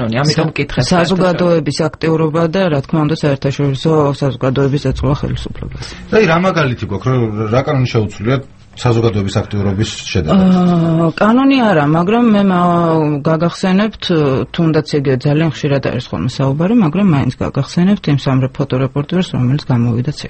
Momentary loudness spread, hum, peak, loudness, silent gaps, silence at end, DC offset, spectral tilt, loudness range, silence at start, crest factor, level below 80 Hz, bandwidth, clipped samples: 6 LU; none; 0 dBFS; -14 LUFS; none; 0 s; under 0.1%; -7 dB/octave; 4 LU; 0 s; 14 dB; -36 dBFS; 8.6 kHz; under 0.1%